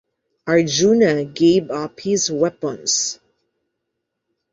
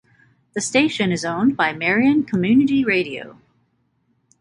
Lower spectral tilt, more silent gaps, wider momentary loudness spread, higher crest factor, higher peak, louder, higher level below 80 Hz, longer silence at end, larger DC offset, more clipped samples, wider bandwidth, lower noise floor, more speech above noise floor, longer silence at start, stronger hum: about the same, -4 dB/octave vs -4.5 dB/octave; neither; about the same, 11 LU vs 10 LU; about the same, 16 dB vs 16 dB; about the same, -4 dBFS vs -4 dBFS; about the same, -18 LUFS vs -18 LUFS; about the same, -58 dBFS vs -58 dBFS; first, 1.4 s vs 1.1 s; neither; neither; second, 8 kHz vs 11 kHz; first, -78 dBFS vs -66 dBFS; first, 60 dB vs 48 dB; about the same, 0.45 s vs 0.55 s; neither